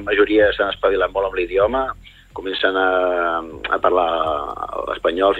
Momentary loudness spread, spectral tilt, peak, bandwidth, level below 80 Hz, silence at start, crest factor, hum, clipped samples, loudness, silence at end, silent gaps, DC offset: 11 LU; -6 dB/octave; -2 dBFS; 8.8 kHz; -42 dBFS; 0 s; 18 dB; none; under 0.1%; -19 LUFS; 0 s; none; under 0.1%